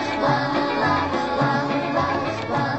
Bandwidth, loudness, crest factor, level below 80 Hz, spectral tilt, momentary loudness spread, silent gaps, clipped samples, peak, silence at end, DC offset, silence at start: 8.4 kHz; -22 LUFS; 14 dB; -50 dBFS; -6 dB/octave; 3 LU; none; under 0.1%; -8 dBFS; 0 s; 0.2%; 0 s